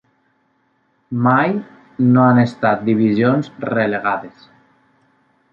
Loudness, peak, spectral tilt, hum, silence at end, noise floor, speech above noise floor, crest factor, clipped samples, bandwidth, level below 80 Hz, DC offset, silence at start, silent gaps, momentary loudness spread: -16 LUFS; -2 dBFS; -9 dB/octave; none; 1.25 s; -63 dBFS; 47 dB; 16 dB; under 0.1%; 7 kHz; -60 dBFS; under 0.1%; 1.1 s; none; 12 LU